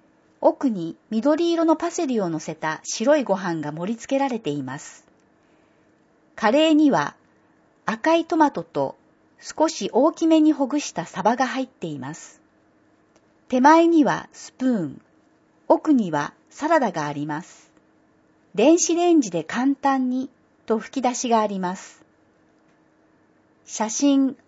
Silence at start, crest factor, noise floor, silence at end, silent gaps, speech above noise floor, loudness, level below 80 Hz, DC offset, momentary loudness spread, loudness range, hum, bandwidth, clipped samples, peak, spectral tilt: 0.4 s; 20 dB; -60 dBFS; 0.15 s; none; 39 dB; -21 LUFS; -72 dBFS; under 0.1%; 14 LU; 5 LU; none; 8 kHz; under 0.1%; -2 dBFS; -4.5 dB/octave